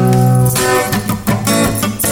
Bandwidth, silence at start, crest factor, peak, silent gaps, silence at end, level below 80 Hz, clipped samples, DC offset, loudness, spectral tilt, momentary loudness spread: 20 kHz; 0 s; 12 dB; -2 dBFS; none; 0 s; -34 dBFS; under 0.1%; under 0.1%; -13 LUFS; -5 dB/octave; 6 LU